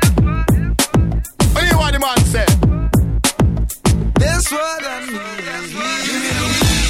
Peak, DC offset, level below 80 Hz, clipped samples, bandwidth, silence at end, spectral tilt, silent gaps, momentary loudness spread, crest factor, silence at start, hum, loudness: 0 dBFS; under 0.1%; -20 dBFS; under 0.1%; 16.5 kHz; 0 s; -4.5 dB/octave; none; 9 LU; 14 dB; 0 s; none; -16 LUFS